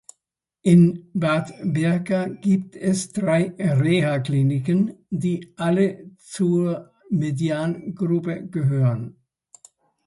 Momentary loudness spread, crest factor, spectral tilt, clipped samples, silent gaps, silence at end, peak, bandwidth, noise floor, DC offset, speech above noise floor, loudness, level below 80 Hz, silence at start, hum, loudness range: 8 LU; 16 dB; -7.5 dB/octave; under 0.1%; none; 0.95 s; -4 dBFS; 11.5 kHz; -82 dBFS; under 0.1%; 61 dB; -22 LUFS; -60 dBFS; 0.65 s; none; 3 LU